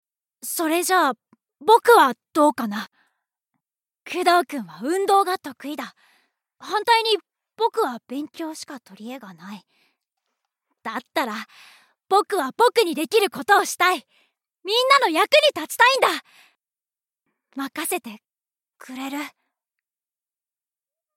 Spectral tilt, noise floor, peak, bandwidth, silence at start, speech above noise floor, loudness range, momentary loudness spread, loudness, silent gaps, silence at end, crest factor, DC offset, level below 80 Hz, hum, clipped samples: -2 dB/octave; under -90 dBFS; -2 dBFS; 17 kHz; 0.45 s; over 69 dB; 14 LU; 21 LU; -20 LUFS; none; 1.85 s; 22 dB; under 0.1%; -86 dBFS; none; under 0.1%